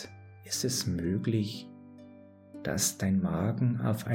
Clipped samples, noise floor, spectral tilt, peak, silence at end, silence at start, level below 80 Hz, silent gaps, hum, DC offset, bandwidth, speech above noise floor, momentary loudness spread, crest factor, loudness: under 0.1%; -53 dBFS; -5 dB/octave; -14 dBFS; 0 s; 0 s; -58 dBFS; none; none; under 0.1%; 17 kHz; 23 dB; 22 LU; 18 dB; -30 LUFS